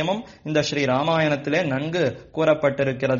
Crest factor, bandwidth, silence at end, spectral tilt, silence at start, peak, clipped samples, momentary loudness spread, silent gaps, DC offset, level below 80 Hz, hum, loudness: 16 dB; 7.2 kHz; 0 s; -4.5 dB/octave; 0 s; -6 dBFS; under 0.1%; 5 LU; none; under 0.1%; -56 dBFS; none; -22 LUFS